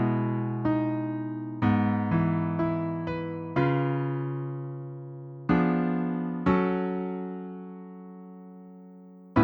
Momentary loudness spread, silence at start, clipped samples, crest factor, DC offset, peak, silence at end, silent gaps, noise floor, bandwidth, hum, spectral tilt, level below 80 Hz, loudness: 19 LU; 0 s; under 0.1%; 18 dB; under 0.1%; -10 dBFS; 0 s; none; -48 dBFS; 5.4 kHz; none; -10.5 dB/octave; -54 dBFS; -28 LUFS